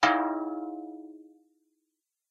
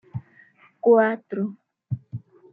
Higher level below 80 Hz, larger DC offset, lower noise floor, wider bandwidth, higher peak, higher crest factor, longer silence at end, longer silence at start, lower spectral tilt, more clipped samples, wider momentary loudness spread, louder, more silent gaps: about the same, -74 dBFS vs -70 dBFS; neither; first, -83 dBFS vs -55 dBFS; first, 8.6 kHz vs 3.8 kHz; second, -10 dBFS vs -6 dBFS; about the same, 22 dB vs 18 dB; first, 1.05 s vs 0.35 s; second, 0 s vs 0.15 s; second, -3 dB/octave vs -11.5 dB/octave; neither; about the same, 22 LU vs 21 LU; second, -31 LUFS vs -23 LUFS; neither